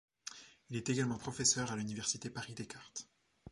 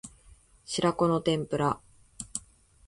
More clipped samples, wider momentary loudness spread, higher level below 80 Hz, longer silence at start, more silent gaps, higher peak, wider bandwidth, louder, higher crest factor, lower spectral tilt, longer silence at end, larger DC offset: neither; first, 18 LU vs 14 LU; second, -68 dBFS vs -58 dBFS; first, 0.25 s vs 0.05 s; neither; second, -16 dBFS vs -12 dBFS; about the same, 11.5 kHz vs 11.5 kHz; second, -37 LUFS vs -29 LUFS; first, 24 dB vs 18 dB; second, -3 dB/octave vs -5 dB/octave; second, 0 s vs 0.5 s; neither